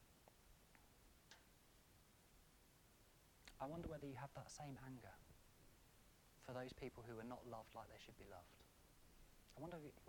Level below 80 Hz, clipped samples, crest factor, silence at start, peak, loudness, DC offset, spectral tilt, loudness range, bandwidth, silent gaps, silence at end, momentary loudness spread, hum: -72 dBFS; under 0.1%; 22 dB; 0 s; -38 dBFS; -57 LUFS; under 0.1%; -5.5 dB/octave; 2 LU; 19 kHz; none; 0 s; 15 LU; none